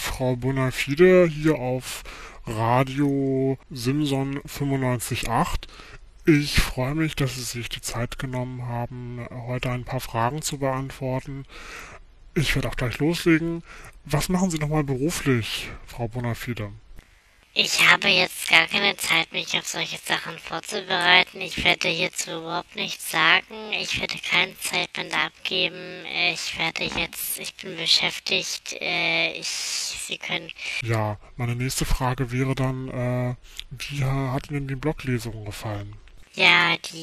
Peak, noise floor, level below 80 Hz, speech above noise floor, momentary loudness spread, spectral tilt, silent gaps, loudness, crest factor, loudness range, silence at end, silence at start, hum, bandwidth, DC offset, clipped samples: 0 dBFS; -56 dBFS; -40 dBFS; 32 dB; 15 LU; -4 dB/octave; none; -23 LUFS; 24 dB; 8 LU; 0 s; 0 s; none; 14 kHz; under 0.1%; under 0.1%